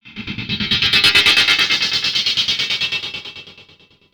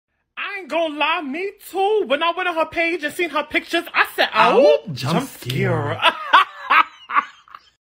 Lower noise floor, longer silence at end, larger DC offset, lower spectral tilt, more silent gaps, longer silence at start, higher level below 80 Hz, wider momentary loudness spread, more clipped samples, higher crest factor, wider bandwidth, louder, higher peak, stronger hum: first, -50 dBFS vs -45 dBFS; about the same, 0.5 s vs 0.5 s; neither; second, -1 dB/octave vs -5 dB/octave; neither; second, 0.05 s vs 0.35 s; first, -48 dBFS vs -58 dBFS; first, 17 LU vs 12 LU; neither; about the same, 18 dB vs 18 dB; first, over 20 kHz vs 16 kHz; first, -14 LUFS vs -19 LUFS; about the same, 0 dBFS vs 0 dBFS; neither